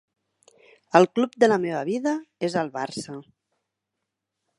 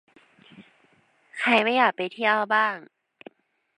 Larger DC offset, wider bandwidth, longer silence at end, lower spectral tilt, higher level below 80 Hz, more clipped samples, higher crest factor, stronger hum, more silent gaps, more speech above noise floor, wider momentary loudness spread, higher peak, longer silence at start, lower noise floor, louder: neither; about the same, 11.5 kHz vs 11 kHz; first, 1.4 s vs 0.95 s; about the same, -5.5 dB/octave vs -4.5 dB/octave; first, -70 dBFS vs -84 dBFS; neither; about the same, 26 dB vs 22 dB; neither; neither; first, 60 dB vs 40 dB; first, 14 LU vs 11 LU; first, 0 dBFS vs -6 dBFS; first, 0.95 s vs 0.6 s; first, -83 dBFS vs -63 dBFS; about the same, -23 LUFS vs -22 LUFS